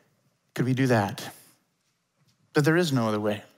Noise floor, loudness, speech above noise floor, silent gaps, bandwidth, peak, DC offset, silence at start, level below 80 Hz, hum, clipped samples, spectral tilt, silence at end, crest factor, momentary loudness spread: -74 dBFS; -25 LUFS; 49 dB; none; 16 kHz; -10 dBFS; under 0.1%; 0.55 s; -72 dBFS; none; under 0.1%; -6 dB/octave; 0.15 s; 18 dB; 16 LU